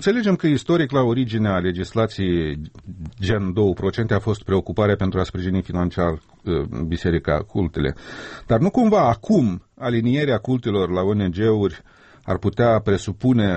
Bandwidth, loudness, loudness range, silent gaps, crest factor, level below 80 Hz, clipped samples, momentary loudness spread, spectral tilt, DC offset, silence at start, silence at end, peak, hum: 8.4 kHz; -21 LUFS; 3 LU; none; 14 dB; -40 dBFS; under 0.1%; 8 LU; -7.5 dB/octave; under 0.1%; 0 s; 0 s; -6 dBFS; none